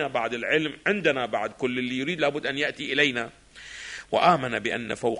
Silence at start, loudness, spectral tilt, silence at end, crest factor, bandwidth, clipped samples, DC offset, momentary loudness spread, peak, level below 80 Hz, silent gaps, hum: 0 s; -25 LUFS; -4.5 dB/octave; 0 s; 20 dB; 10.5 kHz; under 0.1%; under 0.1%; 15 LU; -6 dBFS; -60 dBFS; none; none